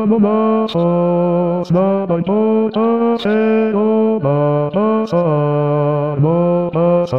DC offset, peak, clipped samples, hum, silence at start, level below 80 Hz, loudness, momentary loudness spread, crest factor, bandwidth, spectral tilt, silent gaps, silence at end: 0.4%; -4 dBFS; under 0.1%; none; 0 s; -54 dBFS; -15 LUFS; 2 LU; 10 dB; 6.2 kHz; -9.5 dB/octave; none; 0 s